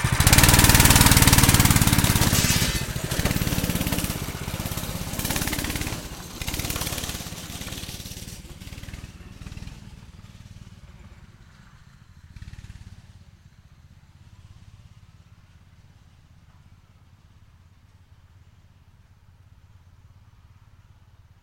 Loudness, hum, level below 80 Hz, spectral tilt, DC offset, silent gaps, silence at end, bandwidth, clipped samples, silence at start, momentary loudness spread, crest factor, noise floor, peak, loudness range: -20 LUFS; none; -34 dBFS; -3.5 dB/octave; under 0.1%; none; 8.7 s; 17 kHz; under 0.1%; 0 s; 27 LU; 22 dB; -54 dBFS; -2 dBFS; 28 LU